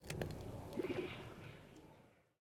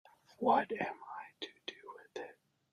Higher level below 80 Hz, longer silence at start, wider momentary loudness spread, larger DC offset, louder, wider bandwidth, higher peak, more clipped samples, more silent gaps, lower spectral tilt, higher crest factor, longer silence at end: first, -62 dBFS vs -82 dBFS; second, 0 s vs 0.4 s; about the same, 18 LU vs 18 LU; neither; second, -47 LUFS vs -38 LUFS; first, 18 kHz vs 12 kHz; second, -24 dBFS vs -18 dBFS; neither; neither; about the same, -6 dB/octave vs -5 dB/octave; about the same, 24 dB vs 22 dB; second, 0.2 s vs 0.4 s